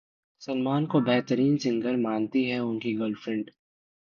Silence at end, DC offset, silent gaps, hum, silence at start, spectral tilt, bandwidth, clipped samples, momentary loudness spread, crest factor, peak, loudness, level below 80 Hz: 0.6 s; under 0.1%; none; none; 0.4 s; -7 dB/octave; 7 kHz; under 0.1%; 9 LU; 18 dB; -10 dBFS; -27 LUFS; -68 dBFS